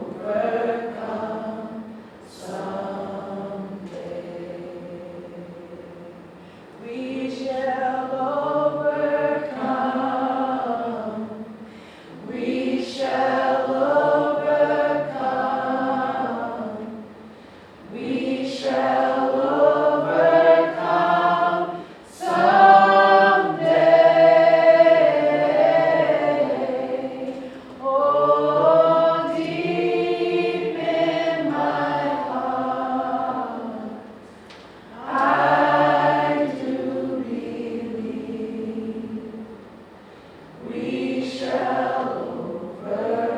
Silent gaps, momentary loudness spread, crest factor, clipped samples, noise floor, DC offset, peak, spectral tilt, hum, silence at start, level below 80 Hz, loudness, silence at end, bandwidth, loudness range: none; 20 LU; 20 dB; under 0.1%; -44 dBFS; under 0.1%; 0 dBFS; -6 dB/octave; none; 0 s; -66 dBFS; -20 LUFS; 0 s; 10 kHz; 16 LU